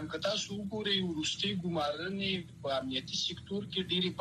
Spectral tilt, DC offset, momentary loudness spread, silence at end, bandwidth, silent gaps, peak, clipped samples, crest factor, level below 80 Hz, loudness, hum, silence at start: -4 dB/octave; under 0.1%; 5 LU; 0 s; 13 kHz; none; -18 dBFS; under 0.1%; 16 dB; -62 dBFS; -34 LUFS; none; 0 s